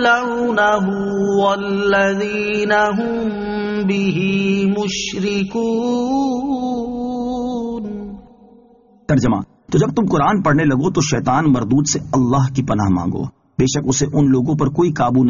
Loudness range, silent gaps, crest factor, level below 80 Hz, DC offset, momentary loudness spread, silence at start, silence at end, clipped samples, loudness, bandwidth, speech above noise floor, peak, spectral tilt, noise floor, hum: 5 LU; none; 14 dB; -42 dBFS; under 0.1%; 8 LU; 0 s; 0 s; under 0.1%; -17 LUFS; 7.4 kHz; 33 dB; -2 dBFS; -5.5 dB/octave; -49 dBFS; none